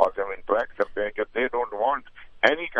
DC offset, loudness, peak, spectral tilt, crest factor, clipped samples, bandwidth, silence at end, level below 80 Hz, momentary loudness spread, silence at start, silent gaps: under 0.1%; -26 LUFS; -2 dBFS; -4.5 dB/octave; 24 dB; under 0.1%; 7.4 kHz; 0 s; -52 dBFS; 6 LU; 0 s; none